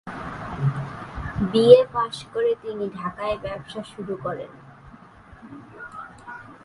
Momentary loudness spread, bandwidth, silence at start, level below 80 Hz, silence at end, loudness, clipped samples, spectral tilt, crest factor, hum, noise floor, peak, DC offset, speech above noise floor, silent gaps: 26 LU; 11 kHz; 0.05 s; -48 dBFS; 0.1 s; -23 LUFS; under 0.1%; -7 dB/octave; 24 dB; none; -47 dBFS; 0 dBFS; under 0.1%; 26 dB; none